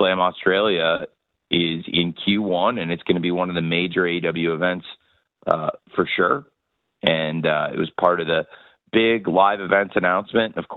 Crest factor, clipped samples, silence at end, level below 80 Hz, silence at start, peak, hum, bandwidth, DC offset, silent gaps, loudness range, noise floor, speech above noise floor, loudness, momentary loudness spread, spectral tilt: 20 dB; under 0.1%; 0 s; -58 dBFS; 0 s; -2 dBFS; none; 4.4 kHz; under 0.1%; none; 3 LU; -75 dBFS; 54 dB; -21 LUFS; 7 LU; -8.5 dB/octave